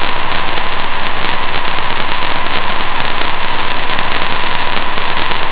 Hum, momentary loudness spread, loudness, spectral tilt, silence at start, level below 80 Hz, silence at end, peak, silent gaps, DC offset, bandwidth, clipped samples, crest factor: none; 1 LU; -16 LUFS; -7 dB/octave; 0 s; -24 dBFS; 0 s; 0 dBFS; none; 4%; 4 kHz; under 0.1%; 8 dB